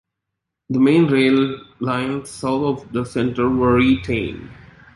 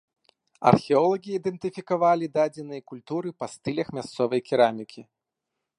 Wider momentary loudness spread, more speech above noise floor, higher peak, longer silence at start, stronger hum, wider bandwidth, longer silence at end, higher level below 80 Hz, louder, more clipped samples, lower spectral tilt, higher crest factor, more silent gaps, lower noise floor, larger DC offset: second, 11 LU vs 15 LU; about the same, 62 dB vs 59 dB; about the same, -4 dBFS vs -2 dBFS; about the same, 0.7 s vs 0.6 s; neither; about the same, 11.5 kHz vs 11 kHz; second, 0.4 s vs 0.75 s; first, -44 dBFS vs -64 dBFS; first, -19 LUFS vs -25 LUFS; neither; about the same, -7 dB/octave vs -7 dB/octave; second, 16 dB vs 24 dB; neither; second, -80 dBFS vs -84 dBFS; neither